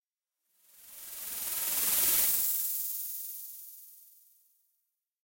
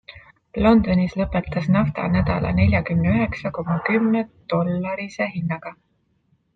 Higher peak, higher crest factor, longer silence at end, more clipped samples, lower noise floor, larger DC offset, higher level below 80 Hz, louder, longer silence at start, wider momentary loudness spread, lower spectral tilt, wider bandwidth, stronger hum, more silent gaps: second, -14 dBFS vs -4 dBFS; about the same, 20 dB vs 16 dB; first, 1.2 s vs 0.8 s; neither; first, -86 dBFS vs -65 dBFS; neither; second, -68 dBFS vs -40 dBFS; second, -28 LUFS vs -21 LUFS; first, 0.8 s vs 0.15 s; first, 22 LU vs 10 LU; second, 1.5 dB/octave vs -9 dB/octave; first, 16.5 kHz vs 6.4 kHz; neither; neither